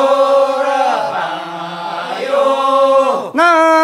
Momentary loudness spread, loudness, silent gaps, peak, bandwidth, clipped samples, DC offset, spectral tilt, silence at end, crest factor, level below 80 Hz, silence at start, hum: 12 LU; -13 LUFS; none; 0 dBFS; 12 kHz; under 0.1%; under 0.1%; -3.5 dB/octave; 0 s; 12 dB; -66 dBFS; 0 s; none